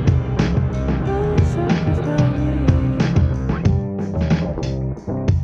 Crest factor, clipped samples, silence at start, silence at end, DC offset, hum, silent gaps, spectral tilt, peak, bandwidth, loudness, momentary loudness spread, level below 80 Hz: 16 dB; under 0.1%; 0 s; 0 s; under 0.1%; none; none; -8.5 dB/octave; -2 dBFS; 7.6 kHz; -19 LUFS; 6 LU; -26 dBFS